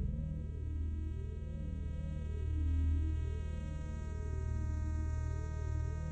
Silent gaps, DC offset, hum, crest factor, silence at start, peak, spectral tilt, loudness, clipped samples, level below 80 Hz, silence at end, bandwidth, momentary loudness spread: none; under 0.1%; none; 10 dB; 0 s; -26 dBFS; -8 dB/octave; -39 LUFS; under 0.1%; -38 dBFS; 0 s; 8 kHz; 7 LU